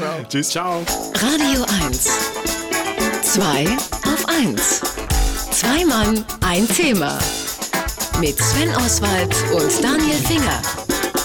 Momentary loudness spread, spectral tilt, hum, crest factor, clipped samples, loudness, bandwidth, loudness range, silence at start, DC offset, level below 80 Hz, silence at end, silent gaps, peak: 5 LU; -3 dB/octave; none; 12 dB; under 0.1%; -18 LUFS; 19.5 kHz; 1 LU; 0 s; under 0.1%; -32 dBFS; 0 s; none; -6 dBFS